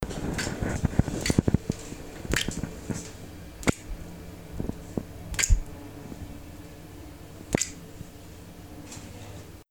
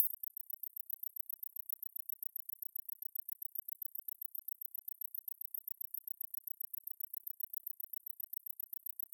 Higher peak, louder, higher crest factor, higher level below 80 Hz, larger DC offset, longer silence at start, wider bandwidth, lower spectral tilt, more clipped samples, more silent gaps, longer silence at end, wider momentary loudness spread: first, -6 dBFS vs -16 dBFS; first, -30 LUFS vs -42 LUFS; about the same, 26 dB vs 30 dB; first, -36 dBFS vs under -90 dBFS; first, 0.2% vs under 0.1%; about the same, 0 s vs 0 s; first, over 20 kHz vs 17.5 kHz; first, -4.5 dB/octave vs 2 dB/octave; neither; neither; second, 0.05 s vs 0.5 s; first, 19 LU vs 1 LU